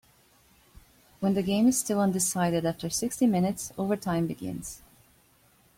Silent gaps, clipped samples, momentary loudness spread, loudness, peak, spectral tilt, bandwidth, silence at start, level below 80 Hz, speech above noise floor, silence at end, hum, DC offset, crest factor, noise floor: none; under 0.1%; 12 LU; -27 LUFS; -12 dBFS; -5 dB/octave; 16.5 kHz; 1.2 s; -58 dBFS; 36 dB; 1 s; none; under 0.1%; 16 dB; -62 dBFS